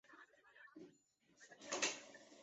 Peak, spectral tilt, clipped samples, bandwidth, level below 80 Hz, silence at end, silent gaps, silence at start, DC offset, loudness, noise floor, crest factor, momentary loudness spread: -24 dBFS; 0.5 dB/octave; under 0.1%; 8 kHz; under -90 dBFS; 0 s; none; 0.05 s; under 0.1%; -43 LUFS; -76 dBFS; 28 dB; 23 LU